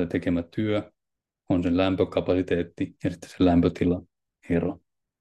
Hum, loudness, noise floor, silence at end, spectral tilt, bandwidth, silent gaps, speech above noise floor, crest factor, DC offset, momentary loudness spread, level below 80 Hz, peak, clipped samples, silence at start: none; -26 LUFS; -86 dBFS; 0.45 s; -8 dB/octave; 9.8 kHz; none; 61 dB; 18 dB; under 0.1%; 10 LU; -54 dBFS; -8 dBFS; under 0.1%; 0 s